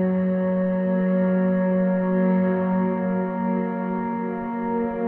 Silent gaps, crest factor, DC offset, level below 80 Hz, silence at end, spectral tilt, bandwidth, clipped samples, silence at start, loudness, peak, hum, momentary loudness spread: none; 10 dB; under 0.1%; -56 dBFS; 0 s; -12 dB/octave; 3.2 kHz; under 0.1%; 0 s; -23 LUFS; -12 dBFS; none; 5 LU